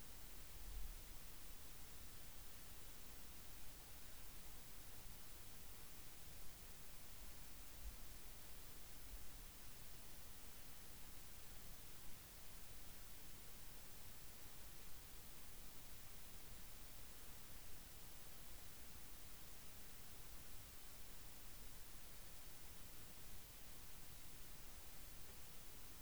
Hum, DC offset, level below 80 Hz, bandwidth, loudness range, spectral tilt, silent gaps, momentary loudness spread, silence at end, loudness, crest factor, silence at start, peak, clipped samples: none; 0.2%; -62 dBFS; over 20 kHz; 0 LU; -2.5 dB/octave; none; 0 LU; 0 s; -56 LUFS; 18 dB; 0 s; -38 dBFS; under 0.1%